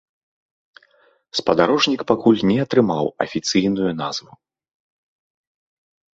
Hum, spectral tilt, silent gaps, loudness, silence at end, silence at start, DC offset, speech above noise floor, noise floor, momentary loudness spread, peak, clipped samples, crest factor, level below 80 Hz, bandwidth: none; -5 dB/octave; none; -19 LUFS; 1.95 s; 1.35 s; under 0.1%; 40 dB; -58 dBFS; 10 LU; -2 dBFS; under 0.1%; 20 dB; -56 dBFS; 8 kHz